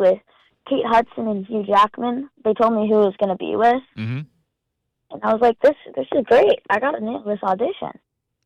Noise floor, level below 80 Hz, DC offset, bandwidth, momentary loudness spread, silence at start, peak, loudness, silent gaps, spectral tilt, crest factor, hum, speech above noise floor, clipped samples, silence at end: -77 dBFS; -58 dBFS; under 0.1%; 9.2 kHz; 12 LU; 0 s; -8 dBFS; -20 LUFS; none; -7 dB/octave; 12 dB; none; 58 dB; under 0.1%; 0.55 s